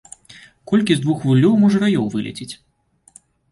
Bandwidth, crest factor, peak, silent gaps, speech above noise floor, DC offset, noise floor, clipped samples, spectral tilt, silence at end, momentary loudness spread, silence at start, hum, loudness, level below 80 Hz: 11.5 kHz; 16 dB; -2 dBFS; none; 39 dB; under 0.1%; -55 dBFS; under 0.1%; -7 dB/octave; 0.95 s; 18 LU; 0.7 s; none; -17 LUFS; -56 dBFS